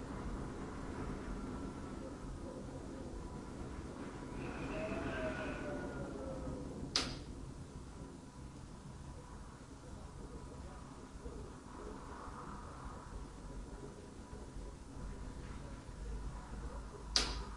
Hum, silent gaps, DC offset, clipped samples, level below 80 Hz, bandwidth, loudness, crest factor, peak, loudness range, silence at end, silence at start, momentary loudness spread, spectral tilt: none; none; under 0.1%; under 0.1%; -52 dBFS; 11.5 kHz; -46 LUFS; 30 dB; -16 dBFS; 10 LU; 0 s; 0 s; 11 LU; -4.5 dB/octave